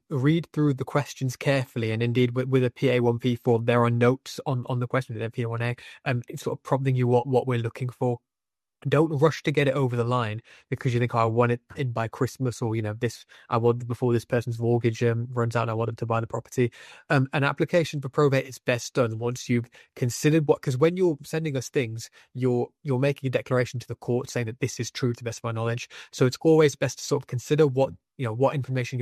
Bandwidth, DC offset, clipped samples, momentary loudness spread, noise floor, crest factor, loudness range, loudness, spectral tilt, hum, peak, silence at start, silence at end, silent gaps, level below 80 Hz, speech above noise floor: 13.5 kHz; under 0.1%; under 0.1%; 9 LU; under -90 dBFS; 18 dB; 3 LU; -26 LUFS; -6.5 dB/octave; none; -6 dBFS; 0.1 s; 0 s; none; -64 dBFS; over 65 dB